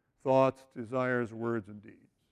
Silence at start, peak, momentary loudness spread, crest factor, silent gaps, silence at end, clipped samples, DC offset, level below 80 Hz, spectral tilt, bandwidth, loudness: 0.25 s; -14 dBFS; 20 LU; 20 dB; none; 0.4 s; under 0.1%; under 0.1%; -72 dBFS; -8 dB/octave; 10.5 kHz; -31 LUFS